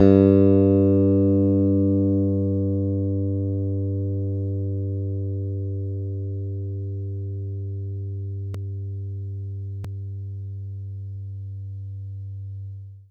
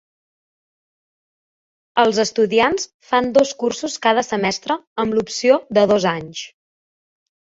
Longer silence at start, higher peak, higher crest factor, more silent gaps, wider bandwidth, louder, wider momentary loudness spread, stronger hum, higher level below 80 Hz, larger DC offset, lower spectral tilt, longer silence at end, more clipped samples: second, 0 s vs 1.95 s; about the same, -4 dBFS vs -2 dBFS; about the same, 20 dB vs 18 dB; second, none vs 2.94-3.00 s, 4.87-4.96 s; second, 3.9 kHz vs 8 kHz; second, -24 LUFS vs -18 LUFS; first, 17 LU vs 9 LU; neither; about the same, -62 dBFS vs -58 dBFS; neither; first, -12.5 dB/octave vs -4 dB/octave; second, 0.1 s vs 1.1 s; neither